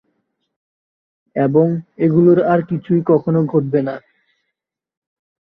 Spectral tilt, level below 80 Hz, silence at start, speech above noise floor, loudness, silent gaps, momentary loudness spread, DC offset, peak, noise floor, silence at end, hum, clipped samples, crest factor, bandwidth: -12 dB/octave; -60 dBFS; 1.35 s; 64 dB; -16 LUFS; none; 8 LU; under 0.1%; -2 dBFS; -79 dBFS; 1.6 s; none; under 0.1%; 16 dB; 4.8 kHz